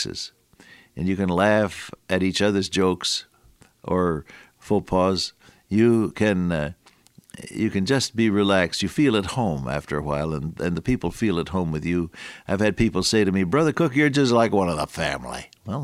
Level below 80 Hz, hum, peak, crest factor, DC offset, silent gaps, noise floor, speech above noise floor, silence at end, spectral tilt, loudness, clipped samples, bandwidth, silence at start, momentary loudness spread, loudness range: -46 dBFS; none; -4 dBFS; 20 dB; under 0.1%; none; -55 dBFS; 33 dB; 0 s; -5.5 dB/octave; -23 LUFS; under 0.1%; 15 kHz; 0 s; 12 LU; 4 LU